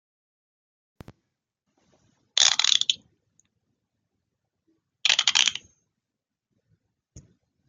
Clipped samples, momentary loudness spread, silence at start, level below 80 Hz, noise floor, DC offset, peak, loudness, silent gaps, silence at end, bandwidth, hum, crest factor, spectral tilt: under 0.1%; 11 LU; 2.35 s; -70 dBFS; -86 dBFS; under 0.1%; 0 dBFS; -21 LUFS; none; 0.5 s; 13 kHz; none; 30 dB; 3 dB/octave